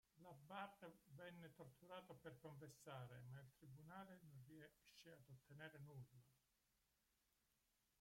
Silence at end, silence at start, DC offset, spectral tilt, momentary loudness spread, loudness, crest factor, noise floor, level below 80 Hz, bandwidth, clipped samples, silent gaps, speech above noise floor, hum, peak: 0.45 s; 0.15 s; under 0.1%; -5.5 dB/octave; 8 LU; -62 LUFS; 22 dB; -87 dBFS; -88 dBFS; 16.5 kHz; under 0.1%; none; 25 dB; none; -40 dBFS